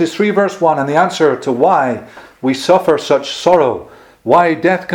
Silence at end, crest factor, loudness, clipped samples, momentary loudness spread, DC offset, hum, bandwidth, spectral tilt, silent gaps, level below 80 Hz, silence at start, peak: 0 s; 14 dB; -13 LUFS; 0.1%; 7 LU; under 0.1%; none; 16.5 kHz; -5 dB/octave; none; -54 dBFS; 0 s; 0 dBFS